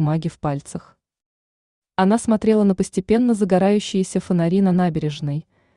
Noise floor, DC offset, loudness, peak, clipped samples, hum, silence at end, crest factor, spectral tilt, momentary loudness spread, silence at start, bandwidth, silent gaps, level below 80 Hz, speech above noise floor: under -90 dBFS; under 0.1%; -19 LUFS; -4 dBFS; under 0.1%; none; 0.35 s; 14 dB; -7 dB/octave; 11 LU; 0 s; 11 kHz; 1.26-1.82 s; -50 dBFS; over 71 dB